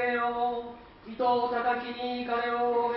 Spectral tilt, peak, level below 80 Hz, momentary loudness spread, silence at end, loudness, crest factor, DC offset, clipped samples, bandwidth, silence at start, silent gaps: -1.5 dB/octave; -16 dBFS; -62 dBFS; 14 LU; 0 s; -29 LUFS; 14 dB; under 0.1%; under 0.1%; 5.6 kHz; 0 s; none